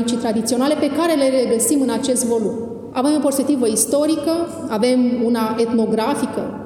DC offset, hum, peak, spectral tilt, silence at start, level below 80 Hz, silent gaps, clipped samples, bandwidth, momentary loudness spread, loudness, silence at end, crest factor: under 0.1%; none; -2 dBFS; -4 dB/octave; 0 s; -58 dBFS; none; under 0.1%; 17.5 kHz; 6 LU; -18 LUFS; 0 s; 16 dB